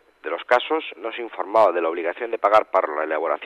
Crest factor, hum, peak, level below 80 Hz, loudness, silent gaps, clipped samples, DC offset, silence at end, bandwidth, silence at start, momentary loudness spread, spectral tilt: 16 dB; none; -6 dBFS; -70 dBFS; -22 LUFS; none; under 0.1%; under 0.1%; 0 s; 8.8 kHz; 0.25 s; 12 LU; -4 dB/octave